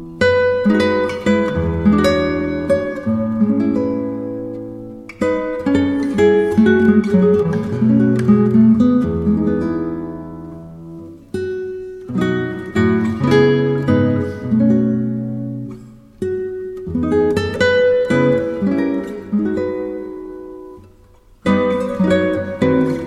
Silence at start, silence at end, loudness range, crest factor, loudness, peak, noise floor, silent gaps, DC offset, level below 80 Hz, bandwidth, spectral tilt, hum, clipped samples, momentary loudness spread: 0 s; 0 s; 8 LU; 16 dB; -16 LUFS; -2 dBFS; -47 dBFS; none; under 0.1%; -42 dBFS; 10.5 kHz; -8 dB/octave; none; under 0.1%; 16 LU